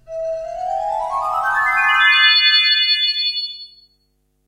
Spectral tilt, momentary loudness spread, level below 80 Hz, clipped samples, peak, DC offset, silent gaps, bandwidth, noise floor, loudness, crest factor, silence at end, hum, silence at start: 1 dB/octave; 15 LU; -52 dBFS; under 0.1%; -2 dBFS; under 0.1%; none; 16 kHz; -65 dBFS; -14 LUFS; 16 dB; 0.8 s; none; 0.1 s